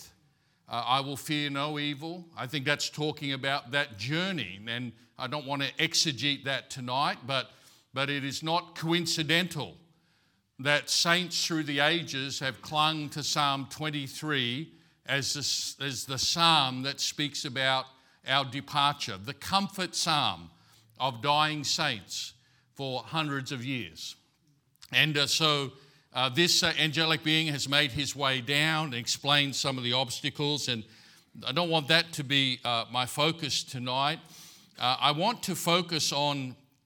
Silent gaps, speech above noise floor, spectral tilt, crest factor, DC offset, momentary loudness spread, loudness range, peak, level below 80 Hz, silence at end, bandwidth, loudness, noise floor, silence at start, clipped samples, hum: none; 40 dB; -3 dB/octave; 26 dB; under 0.1%; 11 LU; 5 LU; -4 dBFS; -70 dBFS; 0.3 s; 18 kHz; -28 LUFS; -70 dBFS; 0 s; under 0.1%; none